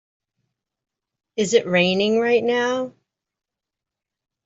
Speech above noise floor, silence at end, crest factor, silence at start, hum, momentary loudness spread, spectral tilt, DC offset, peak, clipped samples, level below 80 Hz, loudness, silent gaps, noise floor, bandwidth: 67 dB; 1.55 s; 20 dB; 1.35 s; none; 11 LU; -4.5 dB/octave; under 0.1%; -4 dBFS; under 0.1%; -66 dBFS; -19 LUFS; none; -86 dBFS; 8 kHz